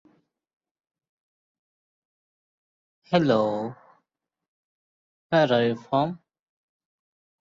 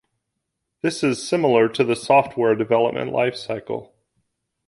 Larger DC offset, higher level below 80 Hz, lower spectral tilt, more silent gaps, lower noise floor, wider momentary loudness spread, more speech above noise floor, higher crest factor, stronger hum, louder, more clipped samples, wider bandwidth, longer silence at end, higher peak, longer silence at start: neither; second, -70 dBFS vs -62 dBFS; first, -7 dB/octave vs -5.5 dB/octave; first, 4.48-5.30 s vs none; first, -83 dBFS vs -79 dBFS; about the same, 11 LU vs 11 LU; about the same, 60 dB vs 59 dB; about the same, 22 dB vs 18 dB; neither; second, -24 LUFS vs -20 LUFS; neither; second, 7.6 kHz vs 11.5 kHz; first, 1.25 s vs 0.85 s; second, -6 dBFS vs -2 dBFS; first, 3.1 s vs 0.85 s